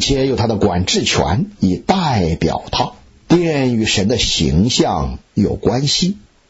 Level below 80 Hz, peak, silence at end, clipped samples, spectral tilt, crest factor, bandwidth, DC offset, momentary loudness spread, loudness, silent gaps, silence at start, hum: -32 dBFS; -2 dBFS; 0.3 s; under 0.1%; -5 dB/octave; 14 dB; 8 kHz; under 0.1%; 5 LU; -16 LUFS; none; 0 s; none